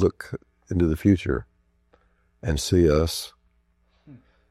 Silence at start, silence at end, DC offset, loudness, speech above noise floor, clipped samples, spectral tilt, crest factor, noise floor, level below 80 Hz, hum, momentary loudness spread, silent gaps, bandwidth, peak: 0 s; 0.35 s; under 0.1%; -23 LUFS; 43 dB; under 0.1%; -6 dB/octave; 20 dB; -65 dBFS; -40 dBFS; none; 18 LU; none; 15 kHz; -6 dBFS